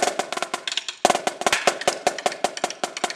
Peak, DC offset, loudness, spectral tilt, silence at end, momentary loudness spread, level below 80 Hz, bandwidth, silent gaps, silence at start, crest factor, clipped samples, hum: -2 dBFS; under 0.1%; -24 LUFS; -1 dB/octave; 0 s; 7 LU; -64 dBFS; 15.5 kHz; none; 0 s; 22 dB; under 0.1%; none